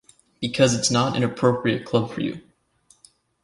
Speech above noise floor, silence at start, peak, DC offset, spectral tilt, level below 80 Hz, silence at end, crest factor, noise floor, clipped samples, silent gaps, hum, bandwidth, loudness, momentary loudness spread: 39 dB; 0.4 s; -4 dBFS; under 0.1%; -4.5 dB/octave; -56 dBFS; 1.05 s; 20 dB; -60 dBFS; under 0.1%; none; none; 11.5 kHz; -22 LUFS; 11 LU